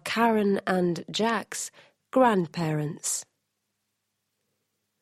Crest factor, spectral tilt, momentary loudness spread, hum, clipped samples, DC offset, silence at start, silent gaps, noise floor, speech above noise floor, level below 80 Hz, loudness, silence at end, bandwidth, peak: 20 dB; -4.5 dB/octave; 10 LU; none; under 0.1%; under 0.1%; 0.05 s; none; -80 dBFS; 54 dB; -70 dBFS; -26 LUFS; 1.8 s; 15 kHz; -8 dBFS